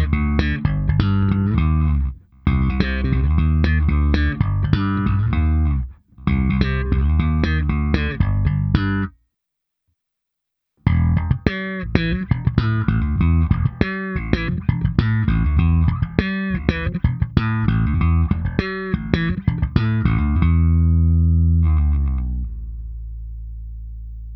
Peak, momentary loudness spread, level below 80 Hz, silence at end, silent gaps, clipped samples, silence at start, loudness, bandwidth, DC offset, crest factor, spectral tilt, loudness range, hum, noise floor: 0 dBFS; 9 LU; -24 dBFS; 0 s; none; under 0.1%; 0 s; -20 LUFS; 5.8 kHz; under 0.1%; 18 dB; -9.5 dB/octave; 4 LU; none; -80 dBFS